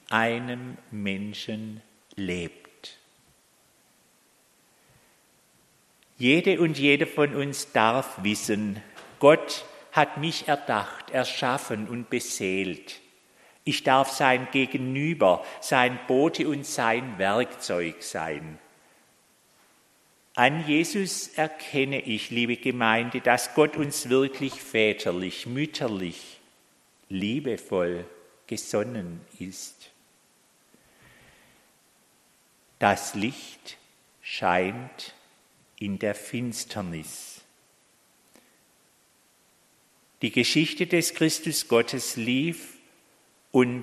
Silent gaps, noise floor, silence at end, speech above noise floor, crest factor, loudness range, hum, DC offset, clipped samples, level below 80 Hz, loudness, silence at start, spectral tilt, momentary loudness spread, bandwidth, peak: none; -63 dBFS; 0 s; 37 dB; 26 dB; 12 LU; none; under 0.1%; under 0.1%; -68 dBFS; -26 LUFS; 0.1 s; -4 dB/octave; 17 LU; 13 kHz; -2 dBFS